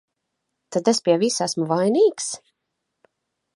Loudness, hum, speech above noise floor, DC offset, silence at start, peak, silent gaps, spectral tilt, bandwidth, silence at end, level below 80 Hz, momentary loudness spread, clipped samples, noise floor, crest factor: -21 LUFS; none; 59 dB; under 0.1%; 0.7 s; -4 dBFS; none; -4.5 dB/octave; 11.5 kHz; 1.2 s; -74 dBFS; 11 LU; under 0.1%; -79 dBFS; 18 dB